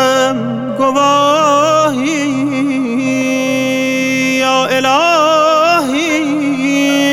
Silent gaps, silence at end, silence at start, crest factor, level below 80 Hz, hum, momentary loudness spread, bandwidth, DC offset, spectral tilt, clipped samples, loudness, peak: none; 0 s; 0 s; 12 dB; -56 dBFS; none; 5 LU; 16 kHz; under 0.1%; -3.5 dB/octave; under 0.1%; -12 LUFS; 0 dBFS